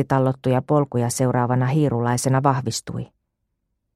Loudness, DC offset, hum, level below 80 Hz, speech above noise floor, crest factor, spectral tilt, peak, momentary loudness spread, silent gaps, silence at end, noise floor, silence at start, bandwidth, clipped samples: -21 LUFS; under 0.1%; none; -54 dBFS; 55 dB; 18 dB; -6 dB/octave; -2 dBFS; 9 LU; none; 0.9 s; -76 dBFS; 0 s; 13.5 kHz; under 0.1%